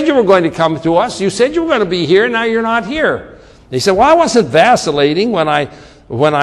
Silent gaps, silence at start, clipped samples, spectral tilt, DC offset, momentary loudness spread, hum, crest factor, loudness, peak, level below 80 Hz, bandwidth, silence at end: none; 0 s; under 0.1%; -5 dB/octave; under 0.1%; 7 LU; none; 12 dB; -12 LUFS; 0 dBFS; -42 dBFS; 12.5 kHz; 0 s